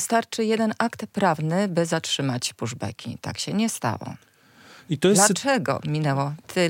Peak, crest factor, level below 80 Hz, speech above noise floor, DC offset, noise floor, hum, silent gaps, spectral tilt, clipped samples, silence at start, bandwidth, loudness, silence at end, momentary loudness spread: -2 dBFS; 22 dB; -70 dBFS; 27 dB; under 0.1%; -51 dBFS; none; none; -4 dB/octave; under 0.1%; 0 s; 17 kHz; -24 LUFS; 0 s; 14 LU